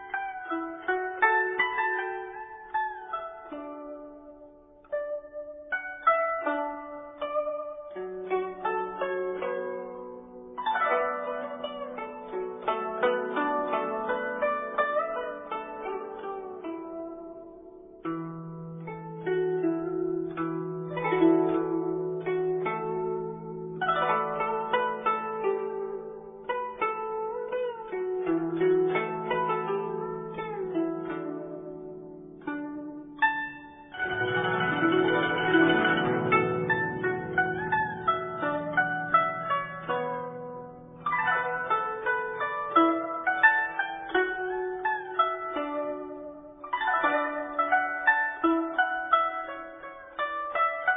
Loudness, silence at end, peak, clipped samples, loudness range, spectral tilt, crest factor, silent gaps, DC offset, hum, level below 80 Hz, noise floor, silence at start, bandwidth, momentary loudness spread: -29 LUFS; 0 s; -8 dBFS; under 0.1%; 8 LU; -9.5 dB/octave; 22 dB; none; under 0.1%; none; -64 dBFS; -52 dBFS; 0 s; 3.8 kHz; 15 LU